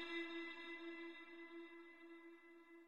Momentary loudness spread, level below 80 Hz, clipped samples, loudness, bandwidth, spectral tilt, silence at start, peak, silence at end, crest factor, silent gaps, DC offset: 14 LU; -90 dBFS; under 0.1%; -53 LUFS; 11.5 kHz; -2.5 dB/octave; 0 s; -36 dBFS; 0 s; 18 dB; none; under 0.1%